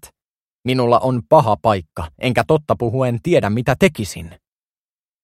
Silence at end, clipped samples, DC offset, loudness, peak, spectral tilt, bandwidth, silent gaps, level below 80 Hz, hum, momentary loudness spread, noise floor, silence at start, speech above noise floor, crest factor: 0.95 s; under 0.1%; under 0.1%; -17 LUFS; 0 dBFS; -6.5 dB/octave; 15.5 kHz; 0.27-0.59 s; -44 dBFS; none; 13 LU; under -90 dBFS; 0.05 s; over 73 dB; 18 dB